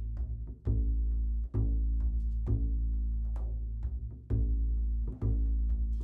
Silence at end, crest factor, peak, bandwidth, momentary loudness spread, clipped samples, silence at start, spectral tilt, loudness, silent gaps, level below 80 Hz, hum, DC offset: 0 s; 12 dB; -18 dBFS; 1.3 kHz; 6 LU; under 0.1%; 0 s; -12 dB/octave; -34 LUFS; none; -32 dBFS; none; under 0.1%